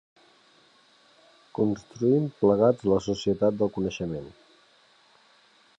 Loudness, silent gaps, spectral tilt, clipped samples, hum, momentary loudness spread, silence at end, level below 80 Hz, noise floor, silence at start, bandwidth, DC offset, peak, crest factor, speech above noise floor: -25 LUFS; none; -7.5 dB/octave; under 0.1%; none; 12 LU; 1.5 s; -58 dBFS; -60 dBFS; 1.6 s; 8.2 kHz; under 0.1%; -10 dBFS; 18 dB; 36 dB